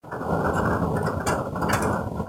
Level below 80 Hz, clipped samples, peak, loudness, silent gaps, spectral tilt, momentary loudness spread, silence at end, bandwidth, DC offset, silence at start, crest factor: -40 dBFS; under 0.1%; -8 dBFS; -25 LUFS; none; -6 dB/octave; 3 LU; 0 s; 16.5 kHz; under 0.1%; 0.05 s; 16 dB